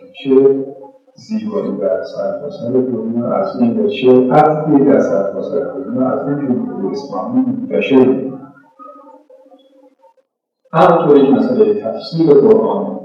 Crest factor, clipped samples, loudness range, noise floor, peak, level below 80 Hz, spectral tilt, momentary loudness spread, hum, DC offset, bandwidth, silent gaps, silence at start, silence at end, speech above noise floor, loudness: 14 dB; under 0.1%; 5 LU; -61 dBFS; 0 dBFS; -64 dBFS; -8.5 dB/octave; 12 LU; none; under 0.1%; 6.8 kHz; none; 0 s; 0 s; 48 dB; -14 LUFS